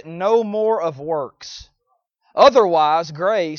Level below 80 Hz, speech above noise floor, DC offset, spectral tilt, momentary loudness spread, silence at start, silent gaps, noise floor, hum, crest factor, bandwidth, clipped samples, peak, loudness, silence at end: -58 dBFS; 52 dB; under 0.1%; -5 dB/octave; 20 LU; 0.05 s; none; -69 dBFS; none; 18 dB; 7 kHz; under 0.1%; 0 dBFS; -17 LUFS; 0 s